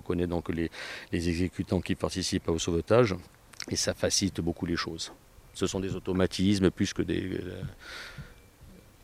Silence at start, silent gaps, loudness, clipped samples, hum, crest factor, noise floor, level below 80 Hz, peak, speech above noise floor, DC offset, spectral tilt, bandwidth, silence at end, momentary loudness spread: 0.05 s; none; -30 LUFS; under 0.1%; none; 22 dB; -53 dBFS; -52 dBFS; -8 dBFS; 23 dB; under 0.1%; -4.5 dB/octave; 16 kHz; 0.25 s; 16 LU